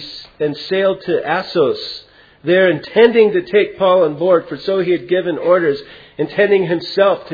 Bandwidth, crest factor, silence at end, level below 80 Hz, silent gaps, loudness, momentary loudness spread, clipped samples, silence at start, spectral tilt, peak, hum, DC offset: 5 kHz; 16 dB; 0 s; -56 dBFS; none; -15 LUFS; 11 LU; under 0.1%; 0 s; -7.5 dB/octave; 0 dBFS; none; under 0.1%